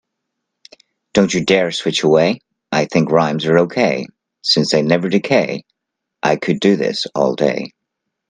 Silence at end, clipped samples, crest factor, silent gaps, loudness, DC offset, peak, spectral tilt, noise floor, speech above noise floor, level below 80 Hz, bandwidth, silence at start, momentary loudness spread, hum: 0.6 s; under 0.1%; 16 dB; none; -16 LUFS; under 0.1%; 0 dBFS; -5 dB/octave; -79 dBFS; 64 dB; -56 dBFS; 9.8 kHz; 1.15 s; 9 LU; none